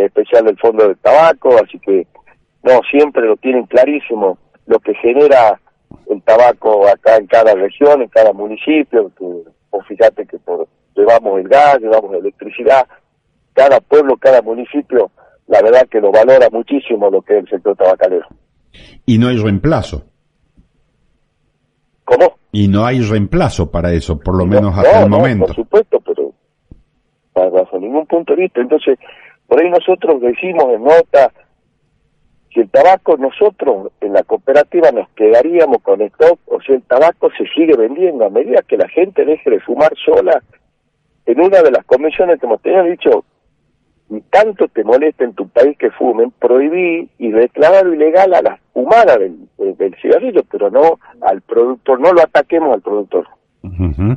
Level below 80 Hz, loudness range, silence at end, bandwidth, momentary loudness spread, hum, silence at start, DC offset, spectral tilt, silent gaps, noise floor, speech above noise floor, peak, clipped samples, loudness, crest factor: -38 dBFS; 5 LU; 0 s; 8.8 kHz; 11 LU; none; 0 s; under 0.1%; -7.5 dB/octave; none; -62 dBFS; 51 dB; 0 dBFS; under 0.1%; -11 LUFS; 12 dB